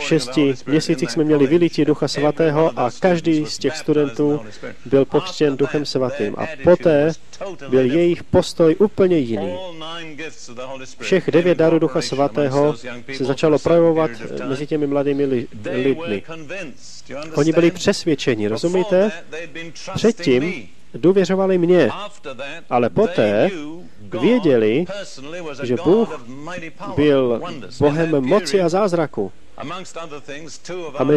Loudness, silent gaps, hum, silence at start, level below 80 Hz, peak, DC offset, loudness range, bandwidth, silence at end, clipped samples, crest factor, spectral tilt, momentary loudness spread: -18 LUFS; none; none; 0 s; -52 dBFS; -2 dBFS; 2%; 3 LU; 12 kHz; 0 s; under 0.1%; 16 dB; -6 dB/octave; 16 LU